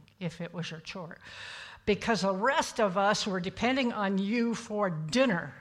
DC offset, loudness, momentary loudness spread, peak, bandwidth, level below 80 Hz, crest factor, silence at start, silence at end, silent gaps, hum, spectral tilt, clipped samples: under 0.1%; -30 LUFS; 15 LU; -12 dBFS; 13 kHz; -60 dBFS; 18 dB; 0.2 s; 0 s; none; none; -4.5 dB/octave; under 0.1%